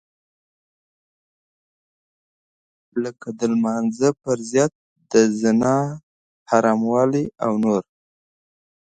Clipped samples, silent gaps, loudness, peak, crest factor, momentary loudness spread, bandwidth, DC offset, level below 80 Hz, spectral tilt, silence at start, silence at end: under 0.1%; 4.75-4.96 s, 6.03-6.46 s; -21 LUFS; -2 dBFS; 20 dB; 10 LU; 9.2 kHz; under 0.1%; -62 dBFS; -6 dB/octave; 2.95 s; 1.1 s